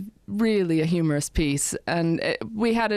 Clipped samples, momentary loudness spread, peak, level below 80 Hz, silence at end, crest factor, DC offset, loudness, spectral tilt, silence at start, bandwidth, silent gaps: under 0.1%; 3 LU; -12 dBFS; -42 dBFS; 0 s; 12 dB; under 0.1%; -24 LUFS; -5 dB/octave; 0 s; 15 kHz; none